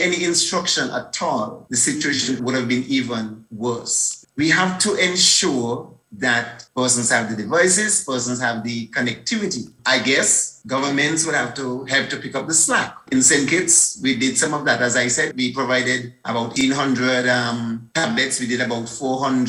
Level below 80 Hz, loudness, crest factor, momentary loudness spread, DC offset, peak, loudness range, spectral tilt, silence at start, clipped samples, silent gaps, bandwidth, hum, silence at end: -60 dBFS; -19 LUFS; 20 dB; 11 LU; under 0.1%; 0 dBFS; 4 LU; -2 dB/octave; 0 s; under 0.1%; none; 16.5 kHz; none; 0 s